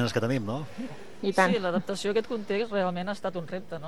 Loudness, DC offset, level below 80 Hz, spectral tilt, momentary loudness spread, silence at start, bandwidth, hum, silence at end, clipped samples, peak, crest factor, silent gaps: -29 LUFS; 0.8%; -66 dBFS; -5.5 dB/octave; 13 LU; 0 s; 13.5 kHz; none; 0 s; under 0.1%; -8 dBFS; 22 dB; none